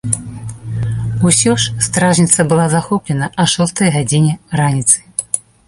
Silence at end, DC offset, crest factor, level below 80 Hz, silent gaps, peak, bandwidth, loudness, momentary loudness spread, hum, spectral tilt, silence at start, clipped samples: 0.3 s; under 0.1%; 14 dB; -40 dBFS; none; 0 dBFS; 13 kHz; -14 LUFS; 10 LU; none; -4 dB/octave; 0.05 s; under 0.1%